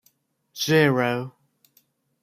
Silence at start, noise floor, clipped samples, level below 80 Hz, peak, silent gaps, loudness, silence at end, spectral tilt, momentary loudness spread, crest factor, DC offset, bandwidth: 0.55 s; -66 dBFS; under 0.1%; -66 dBFS; -6 dBFS; none; -22 LUFS; 0.95 s; -5 dB/octave; 21 LU; 20 dB; under 0.1%; 15.5 kHz